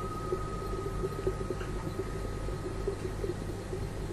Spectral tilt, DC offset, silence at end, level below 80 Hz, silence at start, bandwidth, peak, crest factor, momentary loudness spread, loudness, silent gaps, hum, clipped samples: -6.5 dB/octave; under 0.1%; 0 s; -40 dBFS; 0 s; 13.5 kHz; -18 dBFS; 18 dB; 3 LU; -37 LUFS; none; none; under 0.1%